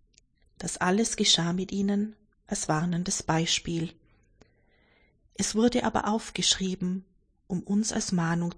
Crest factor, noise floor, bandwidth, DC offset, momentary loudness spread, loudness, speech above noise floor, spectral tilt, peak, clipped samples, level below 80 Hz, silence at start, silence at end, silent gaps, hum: 20 dB; -64 dBFS; 10.5 kHz; under 0.1%; 12 LU; -27 LUFS; 37 dB; -3.5 dB/octave; -8 dBFS; under 0.1%; -54 dBFS; 0.6 s; 0.05 s; none; none